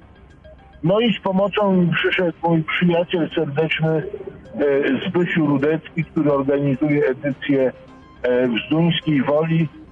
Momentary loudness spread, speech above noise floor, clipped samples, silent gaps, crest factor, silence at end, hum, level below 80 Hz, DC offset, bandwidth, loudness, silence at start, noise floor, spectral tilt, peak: 6 LU; 26 dB; under 0.1%; none; 10 dB; 0.05 s; none; -52 dBFS; under 0.1%; 4.5 kHz; -19 LUFS; 0.45 s; -45 dBFS; -9 dB/octave; -10 dBFS